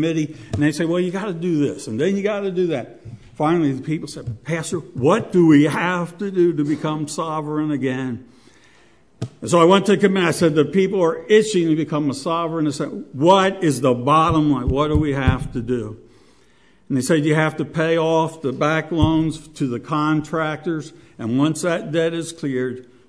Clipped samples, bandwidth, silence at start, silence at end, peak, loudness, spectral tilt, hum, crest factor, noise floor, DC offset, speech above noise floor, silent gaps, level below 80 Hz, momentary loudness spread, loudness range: under 0.1%; 11 kHz; 0 s; 0.25 s; -2 dBFS; -19 LUFS; -6 dB/octave; none; 18 dB; -56 dBFS; 0.2%; 37 dB; none; -40 dBFS; 11 LU; 5 LU